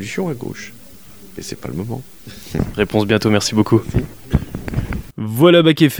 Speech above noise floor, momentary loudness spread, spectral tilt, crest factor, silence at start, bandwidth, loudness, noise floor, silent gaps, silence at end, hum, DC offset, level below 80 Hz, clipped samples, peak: 25 dB; 20 LU; -6 dB/octave; 18 dB; 0 s; over 20 kHz; -17 LUFS; -42 dBFS; none; 0 s; none; 0.9%; -34 dBFS; under 0.1%; 0 dBFS